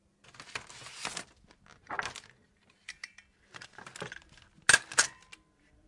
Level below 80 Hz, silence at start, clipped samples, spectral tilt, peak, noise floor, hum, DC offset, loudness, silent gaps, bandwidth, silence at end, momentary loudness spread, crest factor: -68 dBFS; 0.4 s; under 0.1%; 0.5 dB/octave; -10 dBFS; -67 dBFS; none; under 0.1%; -31 LUFS; none; 11.5 kHz; 0.75 s; 26 LU; 28 dB